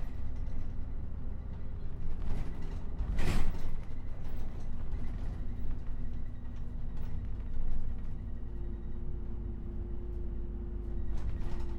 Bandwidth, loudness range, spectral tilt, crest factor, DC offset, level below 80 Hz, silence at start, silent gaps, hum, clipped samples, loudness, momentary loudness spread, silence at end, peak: 5.2 kHz; 2 LU; -7.5 dB/octave; 16 dB; under 0.1%; -34 dBFS; 0 s; none; none; under 0.1%; -42 LUFS; 5 LU; 0 s; -14 dBFS